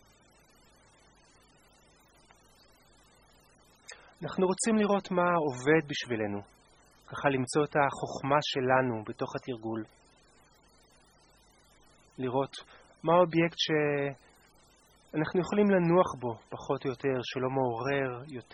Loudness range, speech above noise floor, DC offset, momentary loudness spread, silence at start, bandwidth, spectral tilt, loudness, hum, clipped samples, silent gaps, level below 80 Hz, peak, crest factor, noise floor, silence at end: 10 LU; 33 dB; under 0.1%; 13 LU; 3.9 s; 12 kHz; -5.5 dB/octave; -30 LUFS; none; under 0.1%; none; -66 dBFS; -10 dBFS; 22 dB; -62 dBFS; 0.1 s